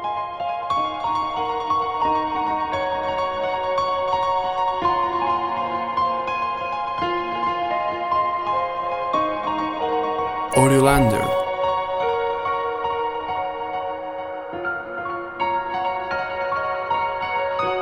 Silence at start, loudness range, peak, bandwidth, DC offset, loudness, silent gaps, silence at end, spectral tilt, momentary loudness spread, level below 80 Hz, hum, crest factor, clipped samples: 0 s; 6 LU; -2 dBFS; 16 kHz; under 0.1%; -23 LUFS; none; 0 s; -5 dB/octave; 6 LU; -46 dBFS; none; 20 dB; under 0.1%